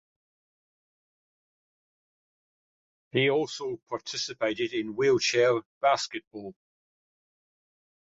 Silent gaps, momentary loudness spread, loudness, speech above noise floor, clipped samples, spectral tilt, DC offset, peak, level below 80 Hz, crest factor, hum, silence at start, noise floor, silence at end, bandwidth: 3.83-3.87 s, 5.65-5.81 s, 6.27-6.31 s; 14 LU; -27 LUFS; over 62 dB; under 0.1%; -4 dB/octave; under 0.1%; -10 dBFS; -74 dBFS; 20 dB; none; 3.15 s; under -90 dBFS; 1.65 s; 7.8 kHz